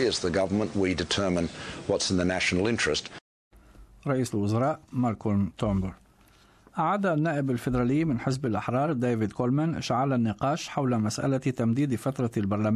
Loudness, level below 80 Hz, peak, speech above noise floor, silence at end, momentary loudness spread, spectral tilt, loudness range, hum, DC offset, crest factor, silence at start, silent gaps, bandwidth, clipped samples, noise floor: -27 LUFS; -48 dBFS; -12 dBFS; 32 dB; 0 s; 5 LU; -5.5 dB/octave; 2 LU; none; under 0.1%; 14 dB; 0 s; 3.21-3.51 s; 14 kHz; under 0.1%; -58 dBFS